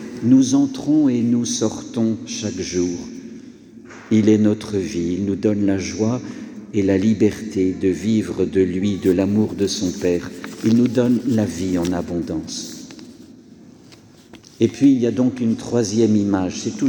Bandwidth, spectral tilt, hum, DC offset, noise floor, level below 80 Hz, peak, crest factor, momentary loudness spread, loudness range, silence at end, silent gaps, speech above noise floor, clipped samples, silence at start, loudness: 19.5 kHz; -6 dB/octave; none; under 0.1%; -46 dBFS; -52 dBFS; -4 dBFS; 16 dB; 12 LU; 4 LU; 0 s; none; 27 dB; under 0.1%; 0 s; -19 LUFS